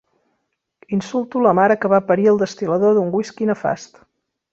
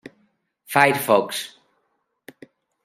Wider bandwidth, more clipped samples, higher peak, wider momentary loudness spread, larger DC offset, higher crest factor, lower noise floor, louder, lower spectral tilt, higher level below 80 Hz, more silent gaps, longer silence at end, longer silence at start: second, 7.8 kHz vs 16 kHz; neither; about the same, -2 dBFS vs -2 dBFS; second, 9 LU vs 13 LU; neither; second, 16 dB vs 22 dB; about the same, -73 dBFS vs -72 dBFS; about the same, -18 LUFS vs -19 LUFS; first, -7 dB/octave vs -3.5 dB/octave; first, -62 dBFS vs -72 dBFS; neither; second, 0.7 s vs 1.35 s; first, 0.9 s vs 0.7 s